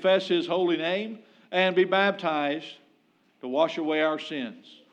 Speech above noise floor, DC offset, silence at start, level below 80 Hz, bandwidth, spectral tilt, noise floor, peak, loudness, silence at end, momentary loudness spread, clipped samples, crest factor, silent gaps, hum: 39 dB; under 0.1%; 0 s; under -90 dBFS; 8.2 kHz; -5.5 dB/octave; -65 dBFS; -10 dBFS; -26 LUFS; 0.2 s; 15 LU; under 0.1%; 16 dB; none; none